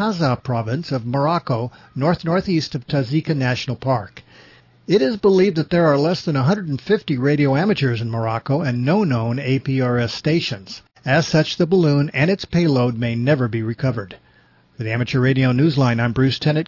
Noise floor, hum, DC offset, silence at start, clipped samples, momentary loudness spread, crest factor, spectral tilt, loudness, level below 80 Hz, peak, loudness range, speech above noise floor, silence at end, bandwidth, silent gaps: -54 dBFS; none; under 0.1%; 0 s; under 0.1%; 7 LU; 14 dB; -7 dB/octave; -19 LUFS; -50 dBFS; -4 dBFS; 3 LU; 36 dB; 0 s; 6 kHz; none